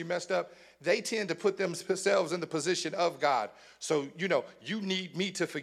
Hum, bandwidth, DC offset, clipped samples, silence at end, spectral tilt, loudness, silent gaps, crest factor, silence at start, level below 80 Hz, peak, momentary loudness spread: none; 14 kHz; under 0.1%; under 0.1%; 0 s; -3.5 dB/octave; -31 LUFS; none; 18 dB; 0 s; -82 dBFS; -14 dBFS; 8 LU